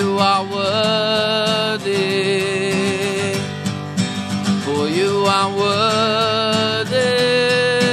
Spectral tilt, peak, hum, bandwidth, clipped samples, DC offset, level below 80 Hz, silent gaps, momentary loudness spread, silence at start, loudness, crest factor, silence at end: -4.5 dB/octave; -2 dBFS; none; 13.5 kHz; under 0.1%; under 0.1%; -56 dBFS; none; 6 LU; 0 s; -17 LUFS; 16 dB; 0 s